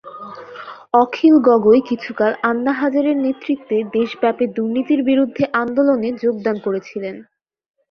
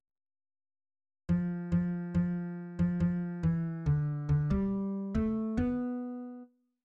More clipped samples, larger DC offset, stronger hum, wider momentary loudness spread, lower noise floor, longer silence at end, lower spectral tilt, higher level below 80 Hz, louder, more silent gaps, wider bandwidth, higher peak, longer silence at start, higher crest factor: neither; neither; neither; first, 17 LU vs 9 LU; second, -35 dBFS vs -53 dBFS; first, 0.7 s vs 0.4 s; second, -7.5 dB/octave vs -10.5 dB/octave; second, -60 dBFS vs -48 dBFS; first, -17 LUFS vs -33 LUFS; neither; first, 6.4 kHz vs 4.7 kHz; first, -2 dBFS vs -20 dBFS; second, 0.05 s vs 1.3 s; about the same, 16 dB vs 14 dB